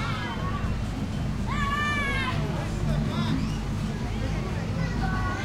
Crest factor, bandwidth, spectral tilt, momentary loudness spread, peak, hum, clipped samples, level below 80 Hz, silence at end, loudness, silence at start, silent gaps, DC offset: 14 dB; 14.5 kHz; -6 dB/octave; 5 LU; -14 dBFS; none; under 0.1%; -34 dBFS; 0 s; -28 LUFS; 0 s; none; under 0.1%